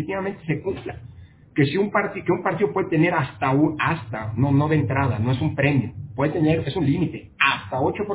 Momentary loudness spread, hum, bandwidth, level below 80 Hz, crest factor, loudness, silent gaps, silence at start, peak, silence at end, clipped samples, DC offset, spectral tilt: 8 LU; none; 4 kHz; -46 dBFS; 20 dB; -22 LUFS; none; 0 s; -2 dBFS; 0 s; under 0.1%; under 0.1%; -11 dB/octave